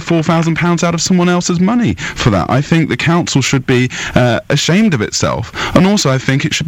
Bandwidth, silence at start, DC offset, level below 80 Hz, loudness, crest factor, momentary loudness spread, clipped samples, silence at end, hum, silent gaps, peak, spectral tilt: 15.5 kHz; 0 s; under 0.1%; -36 dBFS; -13 LUFS; 12 dB; 4 LU; 0.1%; 0 s; none; none; 0 dBFS; -5 dB/octave